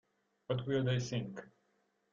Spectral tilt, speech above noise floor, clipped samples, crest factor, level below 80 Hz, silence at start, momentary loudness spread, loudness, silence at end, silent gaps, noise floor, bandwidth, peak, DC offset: -6 dB/octave; 42 dB; under 0.1%; 18 dB; -70 dBFS; 0.5 s; 12 LU; -37 LUFS; 0.65 s; none; -77 dBFS; 7.4 kHz; -22 dBFS; under 0.1%